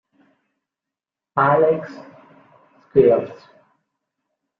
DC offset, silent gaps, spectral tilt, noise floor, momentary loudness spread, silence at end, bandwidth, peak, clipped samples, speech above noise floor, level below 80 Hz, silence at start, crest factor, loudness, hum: under 0.1%; none; -9.5 dB/octave; -87 dBFS; 21 LU; 1.25 s; 5.4 kHz; -2 dBFS; under 0.1%; 70 dB; -58 dBFS; 1.35 s; 22 dB; -18 LUFS; none